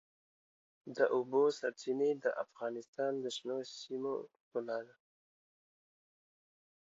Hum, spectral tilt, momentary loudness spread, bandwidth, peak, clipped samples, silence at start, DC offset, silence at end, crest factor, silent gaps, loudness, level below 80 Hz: none; -3 dB/octave; 12 LU; 7.6 kHz; -18 dBFS; under 0.1%; 0.85 s; under 0.1%; 2.05 s; 20 dB; 2.88-2.93 s, 4.41-4.51 s; -37 LUFS; under -90 dBFS